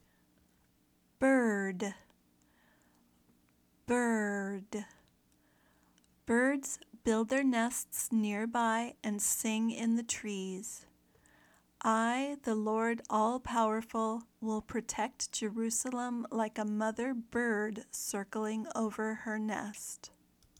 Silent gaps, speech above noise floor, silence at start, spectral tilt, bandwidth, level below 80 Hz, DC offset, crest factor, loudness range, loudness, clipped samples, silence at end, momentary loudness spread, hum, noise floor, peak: none; 37 dB; 1.2 s; -3.5 dB/octave; 19 kHz; -70 dBFS; under 0.1%; 16 dB; 5 LU; -34 LUFS; under 0.1%; 0.5 s; 11 LU; none; -71 dBFS; -18 dBFS